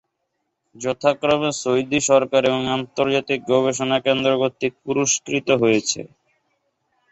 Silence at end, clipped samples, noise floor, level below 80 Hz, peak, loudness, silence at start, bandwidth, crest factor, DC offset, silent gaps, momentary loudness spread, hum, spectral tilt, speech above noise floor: 1.05 s; under 0.1%; -75 dBFS; -58 dBFS; -4 dBFS; -20 LUFS; 0.75 s; 8.2 kHz; 18 dB; under 0.1%; none; 6 LU; none; -3.5 dB/octave; 55 dB